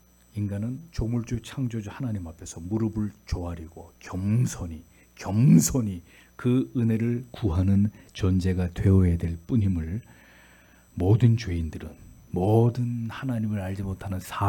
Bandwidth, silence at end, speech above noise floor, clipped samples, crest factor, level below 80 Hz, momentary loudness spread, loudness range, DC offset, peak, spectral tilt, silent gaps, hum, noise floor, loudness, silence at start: 18 kHz; 0 s; 30 dB; under 0.1%; 18 dB; -46 dBFS; 16 LU; 7 LU; under 0.1%; -6 dBFS; -7 dB/octave; none; none; -55 dBFS; -26 LUFS; 0.35 s